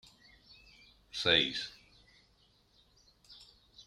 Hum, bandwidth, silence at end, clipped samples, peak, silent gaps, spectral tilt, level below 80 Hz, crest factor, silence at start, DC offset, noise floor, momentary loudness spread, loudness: none; 14 kHz; 0.05 s; under 0.1%; -12 dBFS; none; -3 dB/octave; -68 dBFS; 28 dB; 1.15 s; under 0.1%; -69 dBFS; 28 LU; -31 LUFS